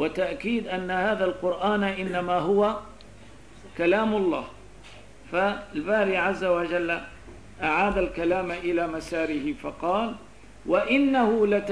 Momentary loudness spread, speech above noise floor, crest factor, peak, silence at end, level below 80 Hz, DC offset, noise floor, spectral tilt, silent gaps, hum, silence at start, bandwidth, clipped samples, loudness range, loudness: 10 LU; 24 dB; 14 dB; -10 dBFS; 0 s; -50 dBFS; 0.3%; -49 dBFS; -6 dB/octave; none; none; 0 s; 11 kHz; under 0.1%; 2 LU; -25 LUFS